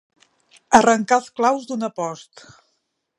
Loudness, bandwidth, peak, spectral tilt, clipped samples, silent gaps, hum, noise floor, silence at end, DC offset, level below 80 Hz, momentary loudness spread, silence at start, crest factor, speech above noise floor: -19 LUFS; 11.5 kHz; 0 dBFS; -3.5 dB/octave; under 0.1%; none; none; -72 dBFS; 0.95 s; under 0.1%; -60 dBFS; 14 LU; 0.7 s; 22 dB; 53 dB